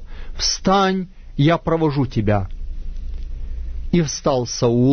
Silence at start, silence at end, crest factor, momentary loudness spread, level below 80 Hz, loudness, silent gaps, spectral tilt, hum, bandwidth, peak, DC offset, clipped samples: 0 s; 0 s; 16 dB; 17 LU; -30 dBFS; -19 LUFS; none; -5.5 dB/octave; none; 6.6 kHz; -4 dBFS; under 0.1%; under 0.1%